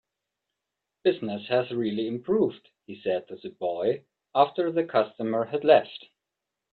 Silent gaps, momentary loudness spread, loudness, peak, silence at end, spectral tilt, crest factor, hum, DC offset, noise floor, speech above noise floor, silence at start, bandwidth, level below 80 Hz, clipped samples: none; 13 LU; -26 LUFS; -4 dBFS; 0.75 s; -9 dB/octave; 22 dB; none; under 0.1%; -86 dBFS; 60 dB; 1.05 s; 4.7 kHz; -72 dBFS; under 0.1%